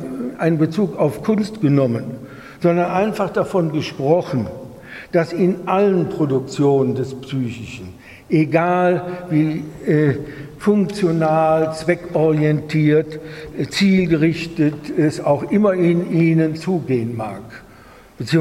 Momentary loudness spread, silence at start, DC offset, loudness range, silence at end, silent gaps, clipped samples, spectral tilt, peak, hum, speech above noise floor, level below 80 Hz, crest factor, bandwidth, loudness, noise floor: 13 LU; 0 s; under 0.1%; 2 LU; 0 s; none; under 0.1%; -7.5 dB/octave; -2 dBFS; none; 26 dB; -50 dBFS; 16 dB; 13 kHz; -18 LUFS; -44 dBFS